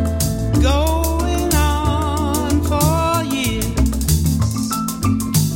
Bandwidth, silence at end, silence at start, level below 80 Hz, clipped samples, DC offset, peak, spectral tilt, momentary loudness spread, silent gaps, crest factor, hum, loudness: 17 kHz; 0 s; 0 s; -22 dBFS; under 0.1%; under 0.1%; -4 dBFS; -5 dB/octave; 4 LU; none; 14 dB; none; -18 LUFS